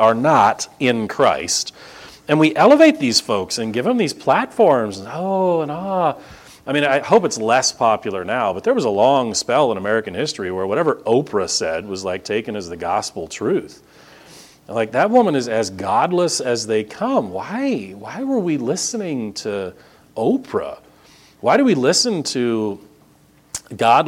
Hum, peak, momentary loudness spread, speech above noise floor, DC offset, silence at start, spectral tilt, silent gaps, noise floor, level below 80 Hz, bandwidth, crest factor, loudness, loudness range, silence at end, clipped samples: none; 0 dBFS; 11 LU; 35 dB; under 0.1%; 0 s; -4 dB/octave; none; -52 dBFS; -58 dBFS; 16.5 kHz; 18 dB; -18 LUFS; 7 LU; 0 s; under 0.1%